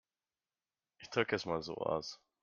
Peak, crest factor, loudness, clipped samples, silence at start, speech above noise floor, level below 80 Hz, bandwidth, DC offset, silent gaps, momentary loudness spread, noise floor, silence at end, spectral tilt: -16 dBFS; 24 dB; -37 LUFS; under 0.1%; 1 s; over 53 dB; -72 dBFS; 7.4 kHz; under 0.1%; none; 11 LU; under -90 dBFS; 0.25 s; -4.5 dB/octave